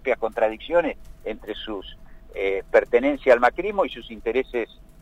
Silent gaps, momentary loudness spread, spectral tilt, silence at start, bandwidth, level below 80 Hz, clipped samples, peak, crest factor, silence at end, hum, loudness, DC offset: none; 16 LU; -5.5 dB/octave; 0.05 s; 9 kHz; -46 dBFS; under 0.1%; -4 dBFS; 20 dB; 0.2 s; none; -23 LUFS; under 0.1%